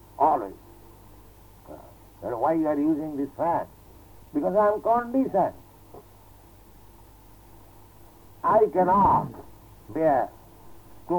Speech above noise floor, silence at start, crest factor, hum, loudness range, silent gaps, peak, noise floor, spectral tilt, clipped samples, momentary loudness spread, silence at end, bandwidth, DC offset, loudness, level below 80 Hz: 28 dB; 0.2 s; 18 dB; none; 5 LU; none; -8 dBFS; -51 dBFS; -8.5 dB/octave; under 0.1%; 18 LU; 0 s; 19.5 kHz; under 0.1%; -24 LUFS; -54 dBFS